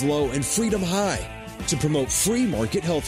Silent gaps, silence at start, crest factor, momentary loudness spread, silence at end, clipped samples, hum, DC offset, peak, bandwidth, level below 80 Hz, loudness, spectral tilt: none; 0 s; 14 dB; 7 LU; 0 s; under 0.1%; none; under 0.1%; -10 dBFS; 16 kHz; -42 dBFS; -23 LUFS; -4.5 dB/octave